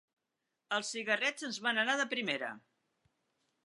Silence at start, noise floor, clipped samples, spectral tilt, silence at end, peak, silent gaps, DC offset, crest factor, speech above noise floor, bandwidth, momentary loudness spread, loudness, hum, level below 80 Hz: 0.7 s; -87 dBFS; under 0.1%; -1.5 dB/octave; 1.1 s; -16 dBFS; none; under 0.1%; 22 dB; 52 dB; 11.5 kHz; 7 LU; -34 LUFS; none; under -90 dBFS